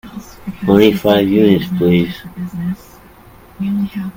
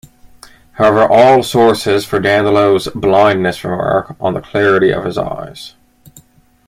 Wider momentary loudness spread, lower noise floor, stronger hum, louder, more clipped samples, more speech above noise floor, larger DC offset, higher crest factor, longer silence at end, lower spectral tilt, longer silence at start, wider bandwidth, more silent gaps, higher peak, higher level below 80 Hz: first, 18 LU vs 12 LU; second, -41 dBFS vs -47 dBFS; neither; about the same, -14 LUFS vs -12 LUFS; neither; second, 28 dB vs 36 dB; neither; about the same, 16 dB vs 14 dB; second, 0.05 s vs 1 s; first, -7.5 dB/octave vs -5.5 dB/octave; second, 0.05 s vs 0.75 s; about the same, 17 kHz vs 15.5 kHz; neither; about the same, 0 dBFS vs 0 dBFS; about the same, -44 dBFS vs -44 dBFS